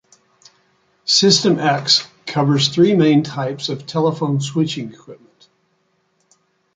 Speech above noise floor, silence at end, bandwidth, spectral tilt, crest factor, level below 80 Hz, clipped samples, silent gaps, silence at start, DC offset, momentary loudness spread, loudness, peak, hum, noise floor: 48 dB; 1.6 s; 9.4 kHz; -4.5 dB/octave; 18 dB; -62 dBFS; under 0.1%; none; 1.05 s; under 0.1%; 12 LU; -16 LUFS; -2 dBFS; none; -64 dBFS